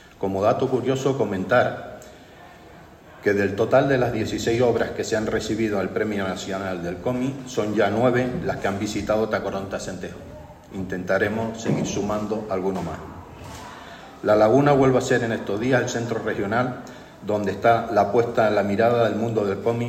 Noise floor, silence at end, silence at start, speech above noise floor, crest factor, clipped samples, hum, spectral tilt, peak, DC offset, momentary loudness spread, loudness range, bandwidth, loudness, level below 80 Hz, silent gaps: -46 dBFS; 0 s; 0.2 s; 24 dB; 18 dB; under 0.1%; none; -6 dB/octave; -4 dBFS; under 0.1%; 17 LU; 5 LU; 15.5 kHz; -22 LUFS; -50 dBFS; none